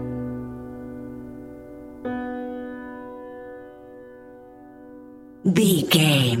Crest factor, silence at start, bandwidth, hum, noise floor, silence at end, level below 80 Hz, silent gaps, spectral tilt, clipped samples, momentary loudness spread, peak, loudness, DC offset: 22 dB; 0 s; 16.5 kHz; none; -45 dBFS; 0 s; -54 dBFS; none; -5 dB/octave; under 0.1%; 26 LU; -4 dBFS; -22 LUFS; under 0.1%